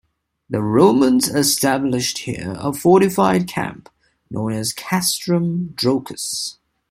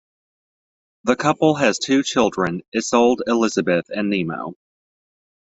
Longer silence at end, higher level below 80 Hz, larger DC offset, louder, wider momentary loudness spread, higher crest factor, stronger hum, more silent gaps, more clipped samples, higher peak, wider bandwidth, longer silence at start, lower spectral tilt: second, 0.4 s vs 1 s; first, -52 dBFS vs -60 dBFS; neither; about the same, -18 LUFS vs -19 LUFS; first, 12 LU vs 8 LU; about the same, 16 dB vs 20 dB; neither; second, none vs 2.68-2.72 s; neither; about the same, -2 dBFS vs -2 dBFS; first, 16.5 kHz vs 8.2 kHz; second, 0.5 s vs 1.05 s; about the same, -4.5 dB/octave vs -4.5 dB/octave